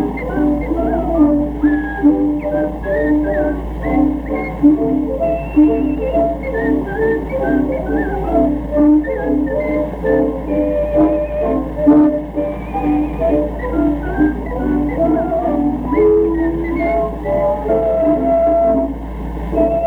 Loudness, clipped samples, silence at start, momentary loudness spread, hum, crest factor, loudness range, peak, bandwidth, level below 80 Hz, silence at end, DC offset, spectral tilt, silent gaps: -16 LUFS; under 0.1%; 0 s; 6 LU; none; 14 dB; 1 LU; 0 dBFS; 3.9 kHz; -28 dBFS; 0 s; under 0.1%; -10 dB/octave; none